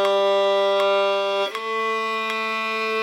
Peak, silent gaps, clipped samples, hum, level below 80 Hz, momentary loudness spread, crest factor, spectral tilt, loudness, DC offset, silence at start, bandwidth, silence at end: -6 dBFS; none; under 0.1%; none; -86 dBFS; 5 LU; 14 dB; -2.5 dB/octave; -21 LUFS; under 0.1%; 0 s; 15.5 kHz; 0 s